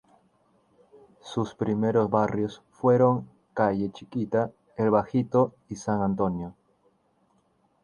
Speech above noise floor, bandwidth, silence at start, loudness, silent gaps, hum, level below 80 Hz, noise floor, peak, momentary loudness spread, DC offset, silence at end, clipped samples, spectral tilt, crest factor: 42 dB; 10.5 kHz; 1.25 s; -26 LUFS; none; none; -58 dBFS; -67 dBFS; -8 dBFS; 11 LU; under 0.1%; 1.3 s; under 0.1%; -8 dB/octave; 20 dB